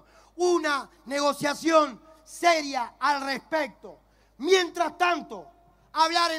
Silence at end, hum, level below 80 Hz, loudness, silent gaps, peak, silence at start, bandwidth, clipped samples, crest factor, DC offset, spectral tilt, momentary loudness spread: 0 s; none; -64 dBFS; -25 LUFS; none; -8 dBFS; 0.35 s; 16 kHz; under 0.1%; 20 dB; under 0.1%; -2.5 dB/octave; 12 LU